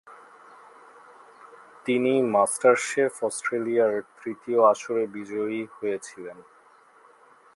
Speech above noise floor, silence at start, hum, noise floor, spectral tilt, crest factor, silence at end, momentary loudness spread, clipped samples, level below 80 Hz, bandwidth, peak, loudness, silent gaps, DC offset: 31 dB; 0.05 s; none; -56 dBFS; -4 dB/octave; 20 dB; 1.15 s; 15 LU; under 0.1%; -78 dBFS; 11.5 kHz; -6 dBFS; -25 LUFS; none; under 0.1%